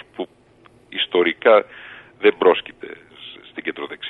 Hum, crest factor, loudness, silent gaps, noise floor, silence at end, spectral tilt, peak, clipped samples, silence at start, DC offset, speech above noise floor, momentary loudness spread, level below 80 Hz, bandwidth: none; 20 dB; -18 LUFS; none; -52 dBFS; 0 s; -6 dB/octave; -2 dBFS; under 0.1%; 0.2 s; under 0.1%; 34 dB; 22 LU; -66 dBFS; 4.2 kHz